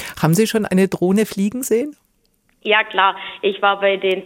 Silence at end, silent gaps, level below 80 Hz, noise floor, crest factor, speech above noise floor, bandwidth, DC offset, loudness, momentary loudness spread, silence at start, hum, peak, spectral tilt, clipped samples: 0 s; none; -58 dBFS; -62 dBFS; 16 dB; 45 dB; 17 kHz; under 0.1%; -17 LUFS; 6 LU; 0 s; none; -2 dBFS; -5 dB/octave; under 0.1%